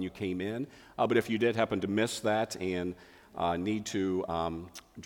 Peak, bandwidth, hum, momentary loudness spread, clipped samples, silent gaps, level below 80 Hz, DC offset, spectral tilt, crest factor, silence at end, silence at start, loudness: -14 dBFS; 19 kHz; none; 12 LU; under 0.1%; none; -60 dBFS; under 0.1%; -5 dB/octave; 18 dB; 0 s; 0 s; -32 LUFS